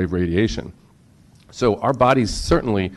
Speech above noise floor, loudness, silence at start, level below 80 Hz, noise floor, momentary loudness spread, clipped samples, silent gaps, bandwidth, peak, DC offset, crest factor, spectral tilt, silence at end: 32 dB; -19 LUFS; 0 s; -36 dBFS; -51 dBFS; 15 LU; under 0.1%; none; 12.5 kHz; -4 dBFS; under 0.1%; 16 dB; -6 dB/octave; 0 s